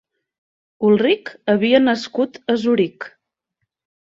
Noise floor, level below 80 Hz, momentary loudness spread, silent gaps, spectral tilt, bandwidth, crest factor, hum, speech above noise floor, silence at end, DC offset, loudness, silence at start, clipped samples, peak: -77 dBFS; -64 dBFS; 8 LU; none; -6 dB/octave; 7.8 kHz; 16 dB; none; 60 dB; 1.05 s; under 0.1%; -18 LUFS; 0.8 s; under 0.1%; -2 dBFS